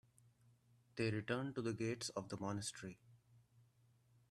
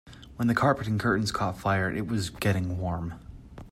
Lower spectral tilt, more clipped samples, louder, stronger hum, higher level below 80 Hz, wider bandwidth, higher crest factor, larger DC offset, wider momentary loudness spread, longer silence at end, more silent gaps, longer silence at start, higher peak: about the same, -5 dB/octave vs -6 dB/octave; neither; second, -44 LUFS vs -28 LUFS; neither; second, -78 dBFS vs -50 dBFS; second, 13.5 kHz vs 16 kHz; about the same, 22 dB vs 18 dB; neither; second, 13 LU vs 19 LU; first, 0.7 s vs 0 s; neither; first, 0.95 s vs 0.05 s; second, -26 dBFS vs -10 dBFS